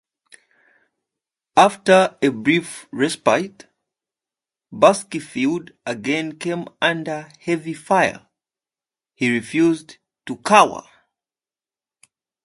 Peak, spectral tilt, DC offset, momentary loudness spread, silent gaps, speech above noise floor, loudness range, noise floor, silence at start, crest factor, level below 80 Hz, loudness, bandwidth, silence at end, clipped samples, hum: 0 dBFS; -4.5 dB/octave; under 0.1%; 15 LU; none; over 71 dB; 4 LU; under -90 dBFS; 1.55 s; 22 dB; -64 dBFS; -19 LUFS; 11.5 kHz; 1.65 s; under 0.1%; none